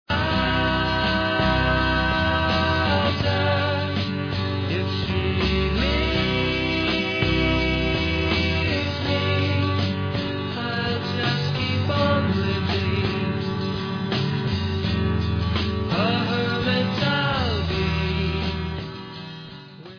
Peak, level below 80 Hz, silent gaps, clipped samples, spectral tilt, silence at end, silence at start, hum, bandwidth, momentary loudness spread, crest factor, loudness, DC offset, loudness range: -8 dBFS; -34 dBFS; none; under 0.1%; -6.5 dB/octave; 0 s; 0.1 s; none; 5.4 kHz; 5 LU; 14 dB; -23 LUFS; under 0.1%; 3 LU